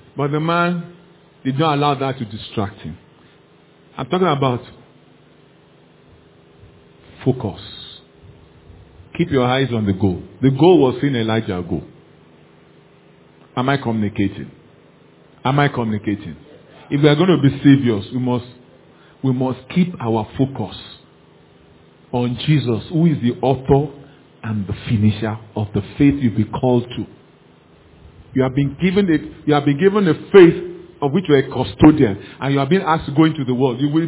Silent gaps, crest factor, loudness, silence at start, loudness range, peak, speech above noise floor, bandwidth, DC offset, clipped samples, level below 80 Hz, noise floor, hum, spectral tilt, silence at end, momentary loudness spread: none; 18 dB; -18 LUFS; 0.15 s; 10 LU; 0 dBFS; 33 dB; 4 kHz; under 0.1%; under 0.1%; -44 dBFS; -50 dBFS; none; -11.5 dB/octave; 0 s; 15 LU